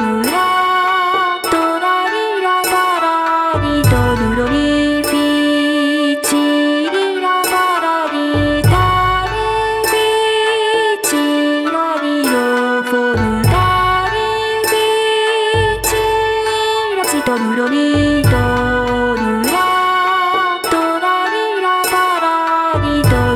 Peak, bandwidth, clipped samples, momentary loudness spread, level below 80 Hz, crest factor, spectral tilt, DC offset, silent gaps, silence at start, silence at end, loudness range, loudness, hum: -2 dBFS; 19.5 kHz; under 0.1%; 3 LU; -32 dBFS; 12 dB; -4.5 dB/octave; under 0.1%; none; 0 s; 0 s; 1 LU; -14 LUFS; none